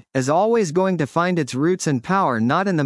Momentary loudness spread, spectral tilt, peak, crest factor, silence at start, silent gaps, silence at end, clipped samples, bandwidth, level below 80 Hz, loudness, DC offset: 3 LU; -6 dB/octave; -4 dBFS; 14 dB; 0.15 s; none; 0 s; under 0.1%; 12 kHz; -66 dBFS; -19 LUFS; under 0.1%